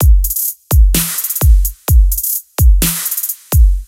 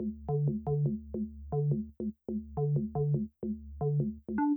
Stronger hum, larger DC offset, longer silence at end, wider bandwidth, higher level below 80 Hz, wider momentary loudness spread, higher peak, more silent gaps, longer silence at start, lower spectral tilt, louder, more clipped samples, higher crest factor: neither; neither; about the same, 0.05 s vs 0 s; first, 17.5 kHz vs 2.2 kHz; first, -12 dBFS vs -50 dBFS; second, 5 LU vs 8 LU; first, 0 dBFS vs -20 dBFS; neither; about the same, 0 s vs 0 s; second, -4 dB/octave vs -14.5 dB/octave; first, -13 LUFS vs -34 LUFS; neither; about the same, 10 dB vs 14 dB